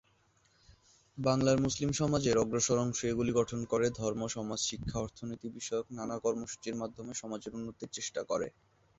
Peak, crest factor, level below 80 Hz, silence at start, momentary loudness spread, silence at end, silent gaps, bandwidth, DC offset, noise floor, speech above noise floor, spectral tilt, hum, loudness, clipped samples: -14 dBFS; 20 dB; -58 dBFS; 1.15 s; 12 LU; 0.5 s; none; 8.2 kHz; under 0.1%; -70 dBFS; 37 dB; -4.5 dB/octave; none; -34 LUFS; under 0.1%